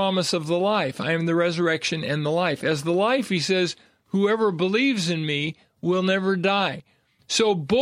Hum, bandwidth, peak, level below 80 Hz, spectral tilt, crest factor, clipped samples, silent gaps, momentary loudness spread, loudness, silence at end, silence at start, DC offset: none; 14.5 kHz; -8 dBFS; -64 dBFS; -5 dB/octave; 16 dB; under 0.1%; none; 5 LU; -23 LUFS; 0 s; 0 s; under 0.1%